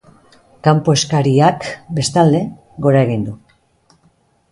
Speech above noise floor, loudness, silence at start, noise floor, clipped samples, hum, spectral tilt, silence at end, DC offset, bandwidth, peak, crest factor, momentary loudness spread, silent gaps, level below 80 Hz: 43 dB; -15 LUFS; 0.65 s; -57 dBFS; under 0.1%; none; -6 dB/octave; 1.15 s; under 0.1%; 11.5 kHz; 0 dBFS; 16 dB; 11 LU; none; -50 dBFS